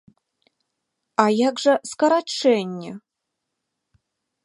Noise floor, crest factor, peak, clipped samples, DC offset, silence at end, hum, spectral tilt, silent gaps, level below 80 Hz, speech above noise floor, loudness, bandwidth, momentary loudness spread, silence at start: -81 dBFS; 22 dB; -2 dBFS; under 0.1%; under 0.1%; 1.45 s; none; -4.5 dB/octave; none; -76 dBFS; 61 dB; -20 LUFS; 11.5 kHz; 15 LU; 1.2 s